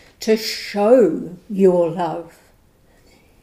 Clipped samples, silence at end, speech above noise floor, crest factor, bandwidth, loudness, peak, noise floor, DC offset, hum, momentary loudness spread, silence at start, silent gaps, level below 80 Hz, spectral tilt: under 0.1%; 1.15 s; 37 dB; 18 dB; 15.5 kHz; -18 LUFS; -2 dBFS; -54 dBFS; under 0.1%; none; 14 LU; 0.2 s; none; -58 dBFS; -5.5 dB/octave